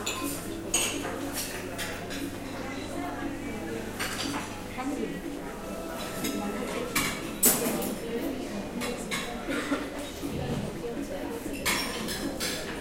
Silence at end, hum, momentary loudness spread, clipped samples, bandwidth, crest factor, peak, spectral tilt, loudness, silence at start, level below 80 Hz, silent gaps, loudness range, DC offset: 0 s; none; 9 LU; under 0.1%; 16 kHz; 24 dB; -8 dBFS; -3 dB/octave; -31 LUFS; 0 s; -48 dBFS; none; 6 LU; under 0.1%